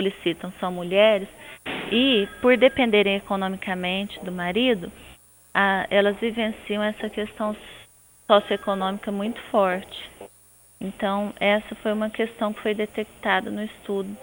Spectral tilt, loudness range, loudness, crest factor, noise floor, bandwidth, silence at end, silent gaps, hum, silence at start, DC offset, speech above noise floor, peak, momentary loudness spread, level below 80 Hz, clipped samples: -5.5 dB/octave; 5 LU; -23 LUFS; 22 dB; -54 dBFS; over 20 kHz; 0 s; none; none; 0 s; under 0.1%; 30 dB; -2 dBFS; 13 LU; -56 dBFS; under 0.1%